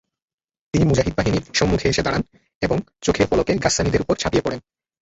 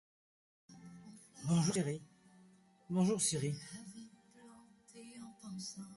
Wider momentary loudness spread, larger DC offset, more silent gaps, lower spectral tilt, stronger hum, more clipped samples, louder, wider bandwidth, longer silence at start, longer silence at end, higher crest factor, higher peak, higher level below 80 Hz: second, 7 LU vs 24 LU; neither; first, 2.55-2.61 s vs none; about the same, -5 dB/octave vs -5 dB/octave; neither; neither; first, -20 LUFS vs -37 LUFS; second, 8.2 kHz vs 11.5 kHz; about the same, 0.75 s vs 0.7 s; first, 0.45 s vs 0 s; about the same, 18 dB vs 20 dB; first, -4 dBFS vs -22 dBFS; first, -36 dBFS vs -74 dBFS